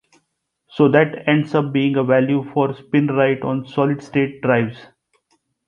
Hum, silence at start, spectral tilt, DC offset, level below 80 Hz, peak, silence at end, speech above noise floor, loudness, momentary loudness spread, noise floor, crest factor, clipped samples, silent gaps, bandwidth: none; 0.75 s; -8.5 dB/octave; under 0.1%; -60 dBFS; -2 dBFS; 0.85 s; 55 dB; -18 LUFS; 6 LU; -72 dBFS; 18 dB; under 0.1%; none; 7 kHz